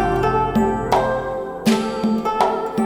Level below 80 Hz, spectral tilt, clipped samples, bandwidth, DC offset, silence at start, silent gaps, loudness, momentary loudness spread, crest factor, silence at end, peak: -36 dBFS; -6 dB/octave; under 0.1%; 18 kHz; under 0.1%; 0 s; none; -20 LUFS; 4 LU; 16 dB; 0 s; -2 dBFS